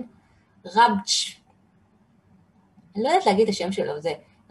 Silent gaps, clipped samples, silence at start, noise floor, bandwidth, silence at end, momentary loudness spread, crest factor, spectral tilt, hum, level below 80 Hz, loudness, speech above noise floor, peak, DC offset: none; under 0.1%; 0 s; -60 dBFS; 12.5 kHz; 0.35 s; 15 LU; 20 dB; -3.5 dB/octave; none; -68 dBFS; -22 LUFS; 38 dB; -6 dBFS; under 0.1%